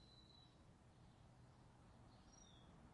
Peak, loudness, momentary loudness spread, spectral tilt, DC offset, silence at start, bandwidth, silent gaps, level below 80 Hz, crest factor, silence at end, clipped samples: -54 dBFS; -68 LUFS; 3 LU; -4.5 dB/octave; under 0.1%; 0 s; 10.5 kHz; none; -74 dBFS; 14 dB; 0 s; under 0.1%